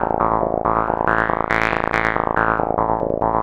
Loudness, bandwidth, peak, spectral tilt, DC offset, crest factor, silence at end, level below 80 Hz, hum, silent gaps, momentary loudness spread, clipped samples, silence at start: -19 LUFS; 13.5 kHz; 0 dBFS; -7 dB/octave; under 0.1%; 18 dB; 0 s; -36 dBFS; none; none; 2 LU; under 0.1%; 0 s